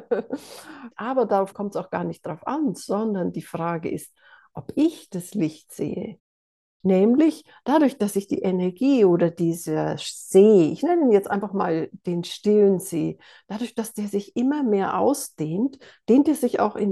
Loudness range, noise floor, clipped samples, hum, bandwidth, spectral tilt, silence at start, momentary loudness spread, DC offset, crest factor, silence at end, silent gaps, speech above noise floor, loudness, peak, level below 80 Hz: 8 LU; under -90 dBFS; under 0.1%; none; 12.5 kHz; -6.5 dB/octave; 0 s; 14 LU; under 0.1%; 18 dB; 0 s; 6.20-6.80 s; over 68 dB; -23 LUFS; -4 dBFS; -68 dBFS